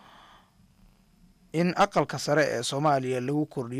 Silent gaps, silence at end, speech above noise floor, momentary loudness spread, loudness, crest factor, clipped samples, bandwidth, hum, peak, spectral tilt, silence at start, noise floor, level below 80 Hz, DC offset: none; 0 s; 34 dB; 5 LU; -26 LUFS; 14 dB; under 0.1%; 15.5 kHz; none; -14 dBFS; -5 dB/octave; 1.55 s; -60 dBFS; -62 dBFS; under 0.1%